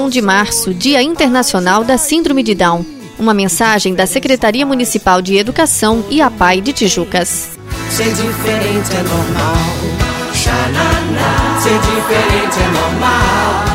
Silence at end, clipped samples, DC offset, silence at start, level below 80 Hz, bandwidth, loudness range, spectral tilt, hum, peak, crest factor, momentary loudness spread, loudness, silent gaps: 0 s; under 0.1%; under 0.1%; 0 s; -28 dBFS; 16.5 kHz; 3 LU; -4 dB/octave; none; 0 dBFS; 12 dB; 5 LU; -12 LUFS; none